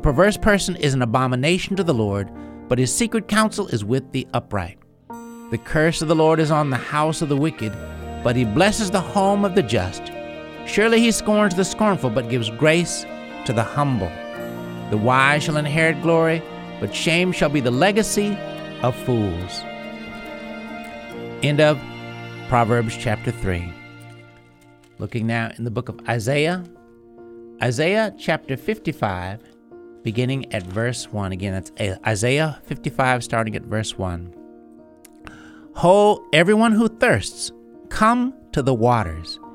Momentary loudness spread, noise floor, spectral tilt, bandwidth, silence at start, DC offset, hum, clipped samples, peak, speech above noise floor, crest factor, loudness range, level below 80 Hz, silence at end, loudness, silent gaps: 16 LU; -50 dBFS; -5 dB/octave; 16 kHz; 0 s; under 0.1%; none; under 0.1%; 0 dBFS; 31 dB; 20 dB; 7 LU; -42 dBFS; 0 s; -20 LUFS; none